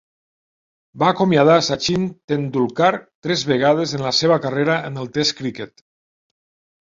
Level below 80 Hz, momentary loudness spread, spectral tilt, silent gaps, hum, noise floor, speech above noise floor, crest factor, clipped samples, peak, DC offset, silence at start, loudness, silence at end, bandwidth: -56 dBFS; 11 LU; -5 dB/octave; 2.24-2.28 s, 3.15-3.22 s; none; under -90 dBFS; over 72 dB; 18 dB; under 0.1%; -2 dBFS; under 0.1%; 0.95 s; -18 LUFS; 1.15 s; 7.8 kHz